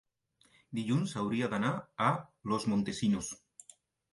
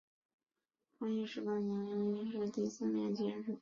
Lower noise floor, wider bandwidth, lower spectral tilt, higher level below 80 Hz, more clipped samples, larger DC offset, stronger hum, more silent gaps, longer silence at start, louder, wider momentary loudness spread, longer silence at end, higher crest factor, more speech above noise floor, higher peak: second, -71 dBFS vs -86 dBFS; first, 11.5 kHz vs 7.4 kHz; second, -5.5 dB/octave vs -7 dB/octave; first, -66 dBFS vs -80 dBFS; neither; neither; neither; neither; second, 0.7 s vs 1 s; first, -33 LUFS vs -39 LUFS; first, 8 LU vs 3 LU; first, 0.75 s vs 0 s; first, 20 dB vs 14 dB; second, 38 dB vs 48 dB; first, -14 dBFS vs -26 dBFS